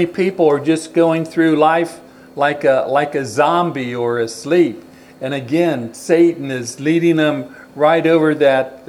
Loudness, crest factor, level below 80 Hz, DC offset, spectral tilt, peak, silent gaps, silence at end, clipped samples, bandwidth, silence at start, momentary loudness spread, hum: -16 LUFS; 16 dB; -64 dBFS; under 0.1%; -6 dB/octave; 0 dBFS; none; 0.1 s; under 0.1%; 12.5 kHz; 0 s; 11 LU; none